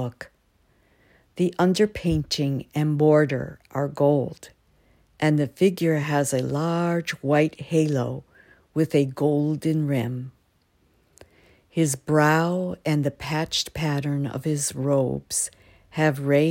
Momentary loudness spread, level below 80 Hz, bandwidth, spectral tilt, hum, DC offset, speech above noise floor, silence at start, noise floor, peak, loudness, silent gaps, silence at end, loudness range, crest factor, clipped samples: 11 LU; -52 dBFS; 16.5 kHz; -5.5 dB/octave; none; under 0.1%; 42 dB; 0 s; -65 dBFS; -6 dBFS; -24 LUFS; none; 0 s; 3 LU; 18 dB; under 0.1%